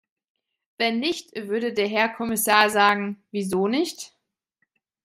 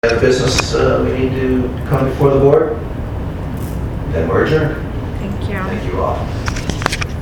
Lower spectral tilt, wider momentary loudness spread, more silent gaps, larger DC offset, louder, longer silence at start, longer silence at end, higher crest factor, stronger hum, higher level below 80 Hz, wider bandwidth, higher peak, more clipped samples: second, -3 dB/octave vs -6 dB/octave; about the same, 12 LU vs 11 LU; neither; neither; second, -23 LUFS vs -16 LUFS; first, 0.8 s vs 0.05 s; first, 1 s vs 0 s; first, 22 dB vs 16 dB; neither; second, -66 dBFS vs -26 dBFS; second, 16 kHz vs 19 kHz; about the same, -2 dBFS vs 0 dBFS; neither